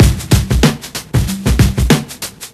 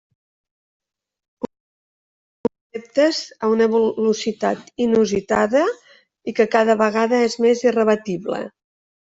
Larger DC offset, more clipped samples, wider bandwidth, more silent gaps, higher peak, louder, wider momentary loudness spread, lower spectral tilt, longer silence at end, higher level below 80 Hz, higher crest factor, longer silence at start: neither; first, 0.3% vs under 0.1%; first, 15 kHz vs 7.8 kHz; neither; first, 0 dBFS vs -4 dBFS; first, -14 LUFS vs -19 LUFS; second, 12 LU vs 16 LU; about the same, -5 dB/octave vs -5 dB/octave; second, 0.05 s vs 0.55 s; first, -18 dBFS vs -60 dBFS; second, 12 dB vs 18 dB; second, 0 s vs 2.75 s